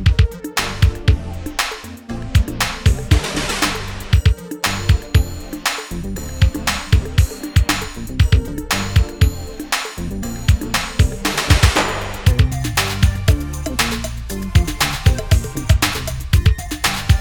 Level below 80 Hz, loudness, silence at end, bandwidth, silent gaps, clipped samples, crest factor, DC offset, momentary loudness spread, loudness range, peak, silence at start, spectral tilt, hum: -22 dBFS; -18 LUFS; 0 s; over 20 kHz; none; under 0.1%; 16 dB; under 0.1%; 9 LU; 2 LU; 0 dBFS; 0 s; -4.5 dB/octave; none